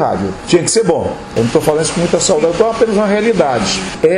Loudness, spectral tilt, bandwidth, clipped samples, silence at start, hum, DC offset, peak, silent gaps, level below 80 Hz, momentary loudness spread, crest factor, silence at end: -13 LUFS; -4.5 dB/octave; 14 kHz; under 0.1%; 0 s; none; under 0.1%; 0 dBFS; none; -40 dBFS; 5 LU; 12 dB; 0 s